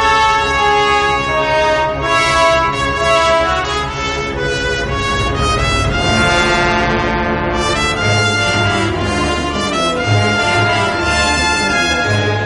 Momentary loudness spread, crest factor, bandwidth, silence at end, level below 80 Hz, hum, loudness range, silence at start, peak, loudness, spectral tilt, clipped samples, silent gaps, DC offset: 5 LU; 14 dB; 11.5 kHz; 0 s; -28 dBFS; none; 2 LU; 0 s; 0 dBFS; -14 LUFS; -4 dB/octave; under 0.1%; none; under 0.1%